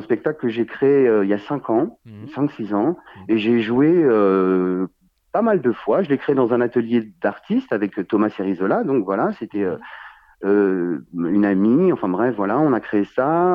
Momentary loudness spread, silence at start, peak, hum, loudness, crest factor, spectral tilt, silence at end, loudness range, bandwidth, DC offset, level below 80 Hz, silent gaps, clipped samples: 9 LU; 0 s; -6 dBFS; none; -19 LUFS; 14 dB; -9.5 dB/octave; 0 s; 3 LU; 5.2 kHz; under 0.1%; -62 dBFS; none; under 0.1%